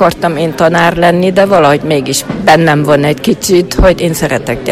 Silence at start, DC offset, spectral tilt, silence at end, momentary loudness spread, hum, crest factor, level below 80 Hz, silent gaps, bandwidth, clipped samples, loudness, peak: 0 s; under 0.1%; -5 dB/octave; 0 s; 6 LU; none; 8 dB; -24 dBFS; none; 16.5 kHz; 1%; -9 LUFS; 0 dBFS